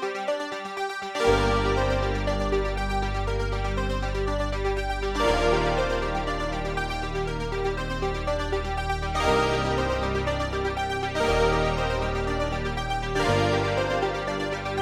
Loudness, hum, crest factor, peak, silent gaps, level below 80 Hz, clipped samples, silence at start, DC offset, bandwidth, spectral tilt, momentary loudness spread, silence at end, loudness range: -26 LUFS; none; 18 dB; -8 dBFS; none; -32 dBFS; under 0.1%; 0 s; under 0.1%; 13.5 kHz; -5.5 dB/octave; 6 LU; 0 s; 2 LU